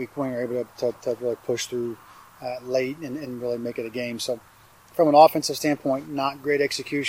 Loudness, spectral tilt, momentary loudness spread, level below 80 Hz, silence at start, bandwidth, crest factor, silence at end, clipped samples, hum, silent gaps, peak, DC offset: -25 LUFS; -4.5 dB/octave; 16 LU; -66 dBFS; 0 s; 16 kHz; 22 dB; 0 s; under 0.1%; none; none; -2 dBFS; under 0.1%